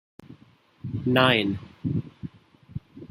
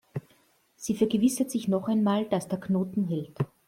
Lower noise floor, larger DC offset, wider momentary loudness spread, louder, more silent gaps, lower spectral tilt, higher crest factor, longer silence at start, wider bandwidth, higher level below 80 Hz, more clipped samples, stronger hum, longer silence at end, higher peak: second, -57 dBFS vs -64 dBFS; neither; first, 22 LU vs 10 LU; first, -24 LUFS vs -27 LUFS; neither; about the same, -7 dB/octave vs -6.5 dB/octave; first, 24 dB vs 16 dB; first, 0.3 s vs 0.15 s; about the same, 16 kHz vs 16 kHz; first, -56 dBFS vs -64 dBFS; neither; neither; second, 0.05 s vs 0.2 s; first, -4 dBFS vs -12 dBFS